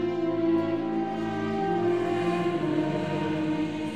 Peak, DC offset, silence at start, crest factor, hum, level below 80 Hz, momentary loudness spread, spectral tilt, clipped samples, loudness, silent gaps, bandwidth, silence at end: -14 dBFS; 0.2%; 0 s; 12 dB; none; -58 dBFS; 4 LU; -7.5 dB/octave; under 0.1%; -27 LUFS; none; 9.6 kHz; 0 s